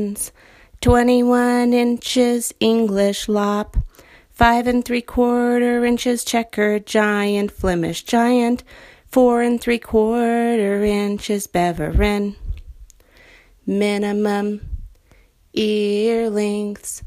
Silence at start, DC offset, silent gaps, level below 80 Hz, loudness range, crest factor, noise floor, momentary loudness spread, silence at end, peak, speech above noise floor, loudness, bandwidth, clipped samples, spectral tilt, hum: 0 s; under 0.1%; none; -34 dBFS; 5 LU; 18 dB; -53 dBFS; 10 LU; 0 s; 0 dBFS; 35 dB; -18 LUFS; 15.5 kHz; under 0.1%; -5 dB/octave; none